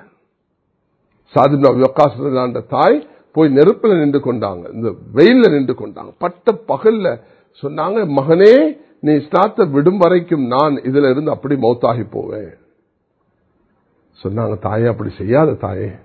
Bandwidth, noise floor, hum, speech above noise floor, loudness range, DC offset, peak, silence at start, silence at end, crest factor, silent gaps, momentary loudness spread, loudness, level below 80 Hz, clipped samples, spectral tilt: 6.4 kHz; -67 dBFS; none; 53 dB; 8 LU; under 0.1%; 0 dBFS; 1.35 s; 0.1 s; 14 dB; none; 13 LU; -14 LUFS; -50 dBFS; 0.2%; -9 dB/octave